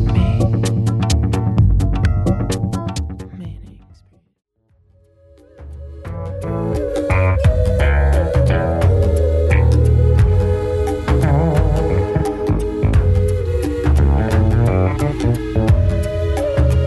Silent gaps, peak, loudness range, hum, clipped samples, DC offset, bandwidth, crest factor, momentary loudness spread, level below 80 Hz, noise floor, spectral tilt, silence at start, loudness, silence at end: none; -2 dBFS; 13 LU; none; under 0.1%; under 0.1%; 12 kHz; 14 dB; 11 LU; -20 dBFS; -56 dBFS; -7.5 dB/octave; 0 s; -17 LUFS; 0 s